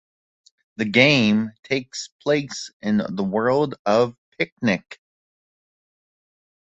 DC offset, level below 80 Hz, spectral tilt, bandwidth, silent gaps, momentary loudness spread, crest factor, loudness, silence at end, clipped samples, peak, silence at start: under 0.1%; -62 dBFS; -5 dB/octave; 8.2 kHz; 1.59-1.63 s, 2.12-2.19 s, 2.73-2.80 s, 3.79-3.85 s, 4.18-4.32 s, 4.52-4.57 s; 13 LU; 22 dB; -21 LUFS; 1.7 s; under 0.1%; -2 dBFS; 0.8 s